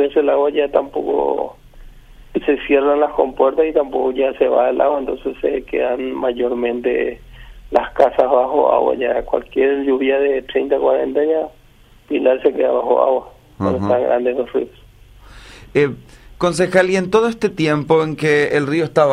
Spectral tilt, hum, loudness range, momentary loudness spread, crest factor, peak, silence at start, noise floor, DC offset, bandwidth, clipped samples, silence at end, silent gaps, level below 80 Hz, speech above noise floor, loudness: -6 dB/octave; none; 3 LU; 7 LU; 16 dB; 0 dBFS; 0 s; -47 dBFS; under 0.1%; 11 kHz; under 0.1%; 0 s; none; -44 dBFS; 31 dB; -17 LUFS